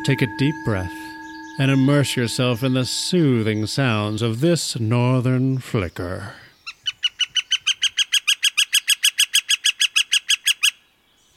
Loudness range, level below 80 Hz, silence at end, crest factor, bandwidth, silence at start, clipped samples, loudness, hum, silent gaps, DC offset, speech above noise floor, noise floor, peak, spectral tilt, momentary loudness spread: 5 LU; -54 dBFS; 0.65 s; 18 dB; 16.5 kHz; 0 s; under 0.1%; -19 LUFS; none; none; under 0.1%; 39 dB; -59 dBFS; -4 dBFS; -3.5 dB/octave; 12 LU